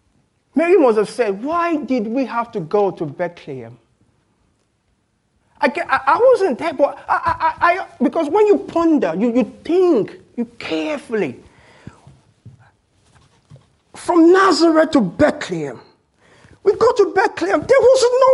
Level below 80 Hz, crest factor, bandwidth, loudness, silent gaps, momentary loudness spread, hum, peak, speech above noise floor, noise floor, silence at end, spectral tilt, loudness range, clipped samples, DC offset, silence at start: -54 dBFS; 16 dB; 11.5 kHz; -16 LUFS; none; 13 LU; none; 0 dBFS; 49 dB; -64 dBFS; 0 s; -5.5 dB/octave; 10 LU; under 0.1%; under 0.1%; 0.55 s